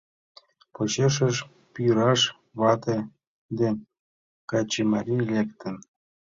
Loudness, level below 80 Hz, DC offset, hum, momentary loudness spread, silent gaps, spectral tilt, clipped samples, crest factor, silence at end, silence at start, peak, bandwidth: -25 LUFS; -62 dBFS; under 0.1%; none; 15 LU; 3.27-3.49 s, 3.99-4.48 s; -5 dB/octave; under 0.1%; 20 dB; 0.4 s; 0.8 s; -8 dBFS; 7.8 kHz